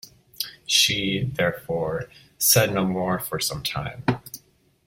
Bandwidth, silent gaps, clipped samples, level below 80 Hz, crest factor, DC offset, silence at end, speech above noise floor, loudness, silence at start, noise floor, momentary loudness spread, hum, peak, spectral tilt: 16.5 kHz; none; under 0.1%; -52 dBFS; 22 dB; under 0.1%; 0.5 s; 34 dB; -23 LUFS; 0.05 s; -57 dBFS; 15 LU; none; -4 dBFS; -3 dB/octave